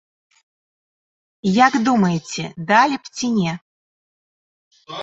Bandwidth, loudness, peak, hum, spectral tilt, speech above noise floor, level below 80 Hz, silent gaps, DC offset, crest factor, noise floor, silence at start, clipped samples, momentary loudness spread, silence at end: 8 kHz; -18 LUFS; -2 dBFS; none; -5 dB/octave; over 72 dB; -62 dBFS; 3.62-4.71 s; under 0.1%; 20 dB; under -90 dBFS; 1.45 s; under 0.1%; 13 LU; 0 s